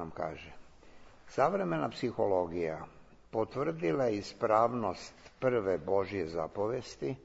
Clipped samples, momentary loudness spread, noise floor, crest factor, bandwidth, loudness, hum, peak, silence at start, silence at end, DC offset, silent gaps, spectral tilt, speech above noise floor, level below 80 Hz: under 0.1%; 11 LU; -54 dBFS; 20 dB; 8 kHz; -33 LUFS; none; -12 dBFS; 0 s; 0 s; under 0.1%; none; -6.5 dB/octave; 21 dB; -62 dBFS